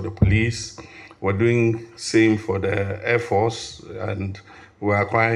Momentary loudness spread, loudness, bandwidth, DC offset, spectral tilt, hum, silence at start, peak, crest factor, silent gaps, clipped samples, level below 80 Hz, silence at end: 14 LU; -22 LUFS; 11 kHz; under 0.1%; -6 dB/octave; none; 0 s; -2 dBFS; 18 dB; none; under 0.1%; -42 dBFS; 0 s